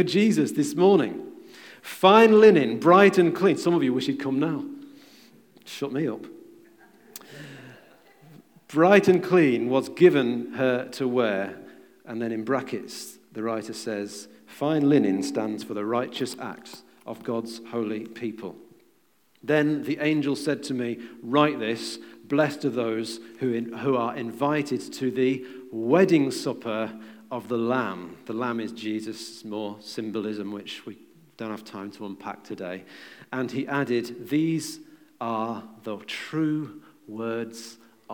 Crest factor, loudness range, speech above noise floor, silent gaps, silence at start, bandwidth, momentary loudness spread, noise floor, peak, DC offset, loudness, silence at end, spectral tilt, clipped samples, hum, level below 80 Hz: 22 dB; 15 LU; 41 dB; none; 0 s; 18.5 kHz; 20 LU; -65 dBFS; -4 dBFS; under 0.1%; -24 LUFS; 0 s; -6 dB/octave; under 0.1%; none; -78 dBFS